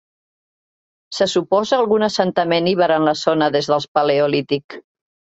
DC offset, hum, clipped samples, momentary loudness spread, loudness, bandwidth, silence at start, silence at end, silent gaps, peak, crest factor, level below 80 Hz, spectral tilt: under 0.1%; none; under 0.1%; 5 LU; -17 LUFS; 8.2 kHz; 1.1 s; 0.45 s; 3.88-3.95 s, 4.64-4.69 s; -2 dBFS; 16 dB; -62 dBFS; -5 dB/octave